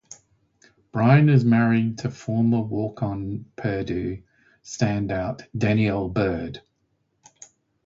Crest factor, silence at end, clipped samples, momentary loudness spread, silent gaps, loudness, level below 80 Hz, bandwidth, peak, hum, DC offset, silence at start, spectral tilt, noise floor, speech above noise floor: 18 dB; 1.3 s; under 0.1%; 15 LU; none; -23 LUFS; -48 dBFS; 7.8 kHz; -4 dBFS; none; under 0.1%; 0.1 s; -7.5 dB/octave; -71 dBFS; 49 dB